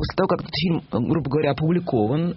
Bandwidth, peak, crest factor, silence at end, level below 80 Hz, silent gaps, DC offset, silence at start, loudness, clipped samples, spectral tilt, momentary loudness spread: 5.8 kHz; -6 dBFS; 16 dB; 0 s; -46 dBFS; none; under 0.1%; 0 s; -22 LUFS; under 0.1%; -6 dB/octave; 2 LU